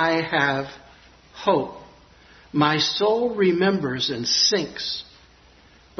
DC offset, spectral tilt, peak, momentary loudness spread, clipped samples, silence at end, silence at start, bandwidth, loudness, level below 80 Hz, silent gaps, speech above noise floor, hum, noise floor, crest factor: under 0.1%; -3.5 dB/octave; -4 dBFS; 11 LU; under 0.1%; 0.95 s; 0 s; 6.4 kHz; -21 LUFS; -58 dBFS; none; 31 dB; none; -53 dBFS; 20 dB